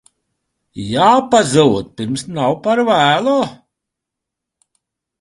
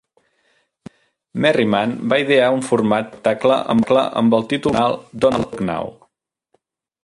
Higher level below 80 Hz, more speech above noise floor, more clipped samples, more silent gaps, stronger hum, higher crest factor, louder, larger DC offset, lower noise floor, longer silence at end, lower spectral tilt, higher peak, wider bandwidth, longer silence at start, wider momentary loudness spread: about the same, -52 dBFS vs -52 dBFS; first, 67 dB vs 51 dB; neither; neither; neither; about the same, 16 dB vs 16 dB; first, -14 LUFS vs -17 LUFS; neither; first, -81 dBFS vs -68 dBFS; first, 1.65 s vs 1.1 s; about the same, -5 dB/octave vs -6 dB/octave; about the same, 0 dBFS vs -2 dBFS; about the same, 11.5 kHz vs 11.5 kHz; second, 0.75 s vs 1.35 s; first, 11 LU vs 8 LU